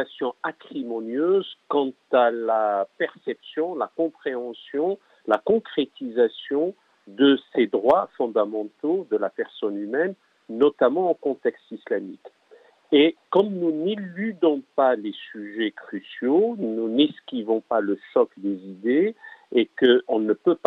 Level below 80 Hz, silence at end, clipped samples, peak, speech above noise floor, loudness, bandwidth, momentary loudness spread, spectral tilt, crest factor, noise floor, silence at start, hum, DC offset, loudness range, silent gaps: -76 dBFS; 0.1 s; under 0.1%; -6 dBFS; 31 dB; -24 LUFS; 4.9 kHz; 11 LU; -7.5 dB/octave; 18 dB; -55 dBFS; 0 s; none; under 0.1%; 3 LU; none